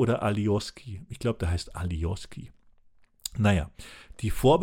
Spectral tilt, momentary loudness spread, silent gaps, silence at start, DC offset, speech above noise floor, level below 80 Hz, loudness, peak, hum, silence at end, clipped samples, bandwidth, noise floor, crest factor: -6.5 dB/octave; 18 LU; none; 0 s; under 0.1%; 31 dB; -40 dBFS; -29 LUFS; -10 dBFS; none; 0 s; under 0.1%; 16.5 kHz; -58 dBFS; 18 dB